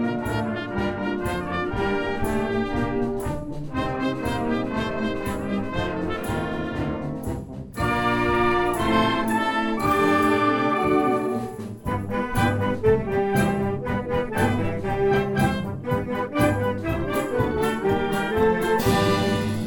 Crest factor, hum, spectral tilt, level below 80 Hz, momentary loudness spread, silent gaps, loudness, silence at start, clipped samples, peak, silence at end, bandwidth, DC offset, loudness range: 16 dB; none; -6.5 dB/octave; -40 dBFS; 7 LU; none; -24 LUFS; 0 s; under 0.1%; -8 dBFS; 0 s; 18 kHz; under 0.1%; 5 LU